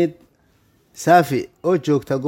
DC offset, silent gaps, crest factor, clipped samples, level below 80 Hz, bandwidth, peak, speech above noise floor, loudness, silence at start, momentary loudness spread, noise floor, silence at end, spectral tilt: under 0.1%; none; 18 dB; under 0.1%; -60 dBFS; 17 kHz; -2 dBFS; 41 dB; -18 LUFS; 0 s; 8 LU; -59 dBFS; 0 s; -6 dB/octave